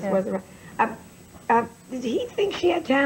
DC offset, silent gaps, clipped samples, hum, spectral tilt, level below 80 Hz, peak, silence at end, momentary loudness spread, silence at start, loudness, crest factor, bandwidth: under 0.1%; none; under 0.1%; none; -5.5 dB/octave; -60 dBFS; -8 dBFS; 0 s; 13 LU; 0 s; -25 LUFS; 16 dB; 16 kHz